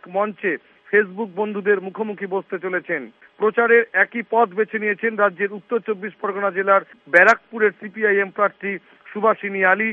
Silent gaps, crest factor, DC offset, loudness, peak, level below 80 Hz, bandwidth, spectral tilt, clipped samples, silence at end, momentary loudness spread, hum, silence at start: none; 20 dB; under 0.1%; -20 LUFS; 0 dBFS; -74 dBFS; 7.8 kHz; -6.5 dB/octave; under 0.1%; 0 s; 12 LU; none; 0.05 s